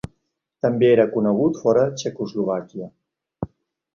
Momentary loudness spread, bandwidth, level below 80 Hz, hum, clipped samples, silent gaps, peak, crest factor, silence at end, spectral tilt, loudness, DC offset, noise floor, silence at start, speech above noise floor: 19 LU; 7.4 kHz; -56 dBFS; none; under 0.1%; none; -4 dBFS; 18 dB; 0.5 s; -6.5 dB/octave; -20 LUFS; under 0.1%; -74 dBFS; 0.65 s; 54 dB